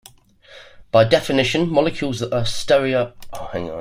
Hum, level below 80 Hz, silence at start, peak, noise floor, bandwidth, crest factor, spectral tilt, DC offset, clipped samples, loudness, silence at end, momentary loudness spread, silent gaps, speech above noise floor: none; -44 dBFS; 0.5 s; -2 dBFS; -48 dBFS; 15.5 kHz; 18 dB; -5 dB/octave; under 0.1%; under 0.1%; -19 LUFS; 0 s; 13 LU; none; 29 dB